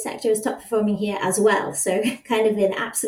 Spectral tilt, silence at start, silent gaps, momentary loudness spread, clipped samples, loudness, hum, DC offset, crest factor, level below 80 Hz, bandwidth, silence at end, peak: -4 dB/octave; 0 s; none; 5 LU; under 0.1%; -22 LUFS; none; under 0.1%; 16 dB; -64 dBFS; 18 kHz; 0 s; -6 dBFS